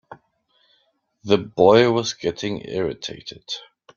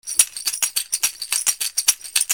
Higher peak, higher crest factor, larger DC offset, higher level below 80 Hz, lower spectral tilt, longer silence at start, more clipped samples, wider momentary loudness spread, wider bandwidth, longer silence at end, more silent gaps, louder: about the same, -2 dBFS vs 0 dBFS; about the same, 20 dB vs 22 dB; neither; first, -58 dBFS vs -64 dBFS; first, -5 dB/octave vs 4.5 dB/octave; about the same, 0.1 s vs 0.05 s; neither; first, 18 LU vs 4 LU; second, 7.2 kHz vs over 20 kHz; first, 0.35 s vs 0 s; neither; about the same, -21 LUFS vs -19 LUFS